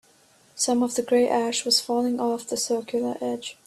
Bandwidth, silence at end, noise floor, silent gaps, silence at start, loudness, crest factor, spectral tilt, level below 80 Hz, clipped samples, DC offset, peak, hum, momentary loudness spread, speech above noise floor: 13.5 kHz; 0.15 s; -58 dBFS; none; 0.55 s; -24 LUFS; 18 dB; -2 dB/octave; -70 dBFS; under 0.1%; under 0.1%; -8 dBFS; none; 7 LU; 34 dB